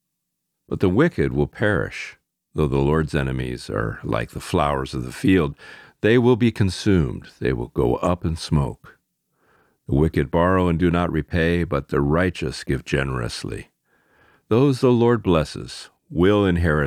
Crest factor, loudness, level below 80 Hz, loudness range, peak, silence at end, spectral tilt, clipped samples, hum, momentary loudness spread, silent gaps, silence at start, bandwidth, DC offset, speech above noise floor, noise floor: 18 dB; -21 LUFS; -36 dBFS; 3 LU; -4 dBFS; 0 s; -7 dB/octave; under 0.1%; none; 12 LU; none; 0.7 s; 14.5 kHz; under 0.1%; 58 dB; -78 dBFS